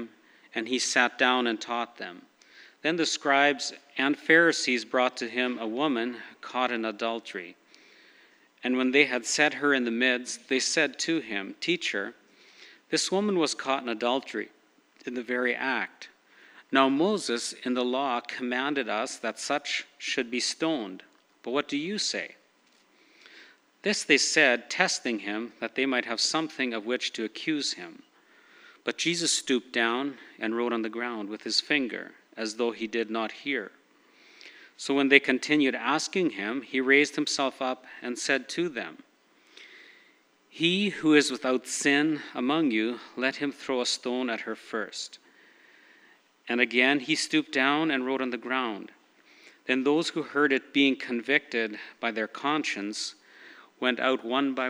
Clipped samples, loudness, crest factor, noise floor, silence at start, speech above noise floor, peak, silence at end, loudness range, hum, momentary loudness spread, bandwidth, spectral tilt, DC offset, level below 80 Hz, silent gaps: under 0.1%; -27 LUFS; 28 dB; -64 dBFS; 0 s; 36 dB; 0 dBFS; 0 s; 6 LU; none; 13 LU; 13 kHz; -2.5 dB/octave; under 0.1%; -88 dBFS; none